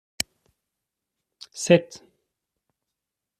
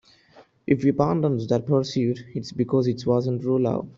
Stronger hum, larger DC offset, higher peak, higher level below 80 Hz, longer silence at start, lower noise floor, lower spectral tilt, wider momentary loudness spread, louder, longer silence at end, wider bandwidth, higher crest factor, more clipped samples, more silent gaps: neither; neither; about the same, -4 dBFS vs -6 dBFS; second, -64 dBFS vs -58 dBFS; first, 1.55 s vs 0.35 s; first, -85 dBFS vs -54 dBFS; second, -4.5 dB/octave vs -8 dB/octave; first, 22 LU vs 6 LU; about the same, -23 LUFS vs -23 LUFS; first, 1.4 s vs 0.05 s; first, 14.5 kHz vs 7.6 kHz; first, 26 dB vs 18 dB; neither; neither